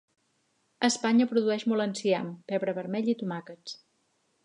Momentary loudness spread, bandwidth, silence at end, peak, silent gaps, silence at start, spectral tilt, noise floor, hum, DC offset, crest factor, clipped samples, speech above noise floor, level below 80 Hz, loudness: 17 LU; 10.5 kHz; 0.7 s; -8 dBFS; none; 0.8 s; -4.5 dB/octave; -73 dBFS; none; under 0.1%; 22 dB; under 0.1%; 45 dB; -82 dBFS; -28 LUFS